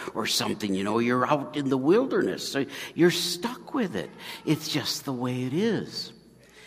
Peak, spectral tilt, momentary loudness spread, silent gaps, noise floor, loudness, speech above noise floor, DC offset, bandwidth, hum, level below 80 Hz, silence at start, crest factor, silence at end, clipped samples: -8 dBFS; -4.5 dB/octave; 10 LU; none; -52 dBFS; -27 LUFS; 26 dB; under 0.1%; 15.5 kHz; none; -66 dBFS; 0 s; 20 dB; 0 s; under 0.1%